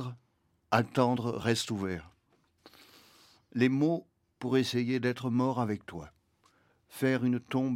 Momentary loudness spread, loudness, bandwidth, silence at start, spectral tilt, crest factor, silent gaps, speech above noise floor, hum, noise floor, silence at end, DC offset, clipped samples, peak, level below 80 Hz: 13 LU; -31 LUFS; 16 kHz; 0 s; -6 dB/octave; 22 dB; none; 43 dB; none; -73 dBFS; 0 s; under 0.1%; under 0.1%; -10 dBFS; -66 dBFS